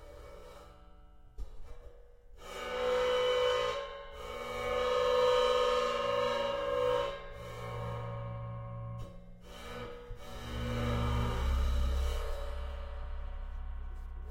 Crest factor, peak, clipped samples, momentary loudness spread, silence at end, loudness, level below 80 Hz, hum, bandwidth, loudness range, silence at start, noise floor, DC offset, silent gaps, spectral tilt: 16 dB; -18 dBFS; under 0.1%; 22 LU; 0 s; -34 LUFS; -40 dBFS; none; 16.5 kHz; 10 LU; 0 s; -54 dBFS; under 0.1%; none; -5 dB/octave